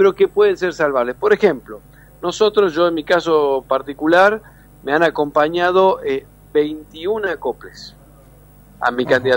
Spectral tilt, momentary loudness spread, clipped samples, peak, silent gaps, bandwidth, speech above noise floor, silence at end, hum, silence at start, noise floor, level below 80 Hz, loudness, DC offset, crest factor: -5 dB/octave; 13 LU; under 0.1%; -2 dBFS; none; 16.5 kHz; 29 dB; 0 s; 50 Hz at -45 dBFS; 0 s; -45 dBFS; -50 dBFS; -17 LUFS; under 0.1%; 16 dB